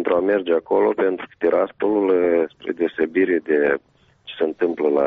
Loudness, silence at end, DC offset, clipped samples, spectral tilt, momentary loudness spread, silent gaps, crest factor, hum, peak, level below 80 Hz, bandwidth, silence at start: -20 LUFS; 0 s; under 0.1%; under 0.1%; -4 dB/octave; 7 LU; none; 12 dB; none; -8 dBFS; -60 dBFS; 4.5 kHz; 0 s